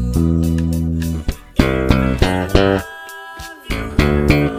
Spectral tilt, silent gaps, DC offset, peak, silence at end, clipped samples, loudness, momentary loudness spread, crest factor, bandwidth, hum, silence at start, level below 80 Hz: -6.5 dB/octave; none; under 0.1%; 0 dBFS; 0 s; under 0.1%; -17 LUFS; 16 LU; 16 dB; 16 kHz; none; 0 s; -24 dBFS